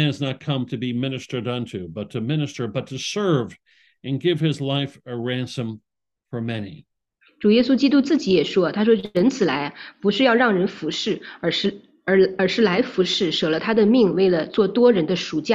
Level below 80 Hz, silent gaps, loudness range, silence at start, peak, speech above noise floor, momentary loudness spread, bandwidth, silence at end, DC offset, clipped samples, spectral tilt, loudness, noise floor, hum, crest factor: -60 dBFS; none; 7 LU; 0 s; -4 dBFS; 41 dB; 13 LU; 9.8 kHz; 0 s; under 0.1%; under 0.1%; -6 dB/octave; -21 LUFS; -62 dBFS; none; 16 dB